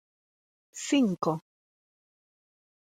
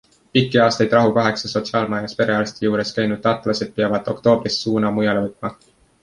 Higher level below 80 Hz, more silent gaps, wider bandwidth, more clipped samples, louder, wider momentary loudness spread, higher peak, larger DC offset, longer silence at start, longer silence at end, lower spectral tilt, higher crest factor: second, -80 dBFS vs -54 dBFS; neither; first, 14.5 kHz vs 11 kHz; neither; second, -29 LUFS vs -19 LUFS; first, 14 LU vs 7 LU; second, -14 dBFS vs -2 dBFS; neither; first, 0.75 s vs 0.35 s; first, 1.6 s vs 0.5 s; about the same, -5 dB/octave vs -5.5 dB/octave; about the same, 20 dB vs 18 dB